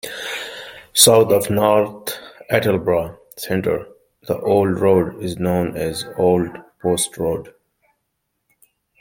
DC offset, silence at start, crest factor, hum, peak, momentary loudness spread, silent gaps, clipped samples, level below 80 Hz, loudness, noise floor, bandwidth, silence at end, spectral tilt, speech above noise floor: under 0.1%; 0.05 s; 20 dB; none; 0 dBFS; 15 LU; none; under 0.1%; -52 dBFS; -18 LUFS; -74 dBFS; 17 kHz; 1.5 s; -4 dB/octave; 56 dB